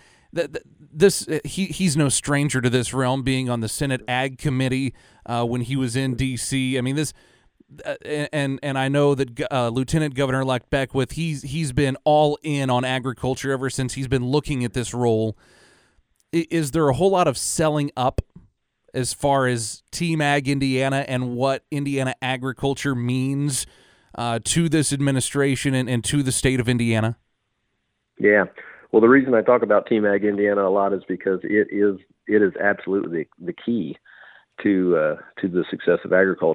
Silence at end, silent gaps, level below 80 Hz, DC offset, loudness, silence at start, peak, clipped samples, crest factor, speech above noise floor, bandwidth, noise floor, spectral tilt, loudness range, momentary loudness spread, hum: 0 s; none; -46 dBFS; under 0.1%; -22 LUFS; 0.35 s; -2 dBFS; under 0.1%; 20 dB; 52 dB; 19.5 kHz; -74 dBFS; -5 dB/octave; 5 LU; 9 LU; none